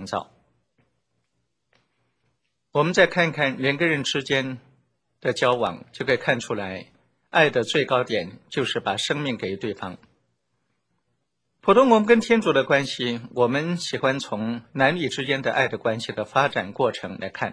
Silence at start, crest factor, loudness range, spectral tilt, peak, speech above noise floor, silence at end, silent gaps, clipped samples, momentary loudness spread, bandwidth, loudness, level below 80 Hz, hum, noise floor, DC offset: 0 s; 22 dB; 5 LU; -5 dB/octave; -2 dBFS; 53 dB; 0 s; none; under 0.1%; 12 LU; 10.5 kHz; -23 LUFS; -62 dBFS; none; -76 dBFS; under 0.1%